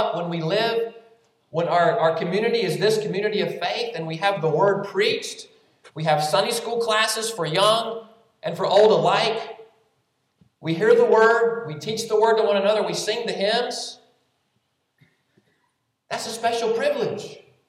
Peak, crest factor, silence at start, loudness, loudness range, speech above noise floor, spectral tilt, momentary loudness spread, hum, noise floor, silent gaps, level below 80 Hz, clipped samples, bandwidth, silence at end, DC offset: -4 dBFS; 18 dB; 0 s; -21 LUFS; 8 LU; 51 dB; -4 dB/octave; 14 LU; none; -72 dBFS; none; -78 dBFS; under 0.1%; 14.5 kHz; 0.3 s; under 0.1%